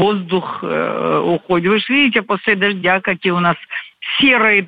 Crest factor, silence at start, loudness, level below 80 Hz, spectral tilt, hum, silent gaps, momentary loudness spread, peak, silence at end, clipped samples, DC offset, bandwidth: 14 dB; 0 s; -15 LUFS; -56 dBFS; -7.5 dB/octave; none; none; 8 LU; -2 dBFS; 0 s; under 0.1%; under 0.1%; 8 kHz